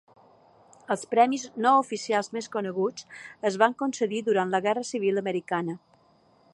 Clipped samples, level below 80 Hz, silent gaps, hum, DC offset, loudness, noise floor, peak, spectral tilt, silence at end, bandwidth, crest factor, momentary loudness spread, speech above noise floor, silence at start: under 0.1%; -78 dBFS; none; none; under 0.1%; -26 LUFS; -62 dBFS; -6 dBFS; -4.5 dB/octave; 0.75 s; 11.5 kHz; 22 dB; 10 LU; 36 dB; 0.9 s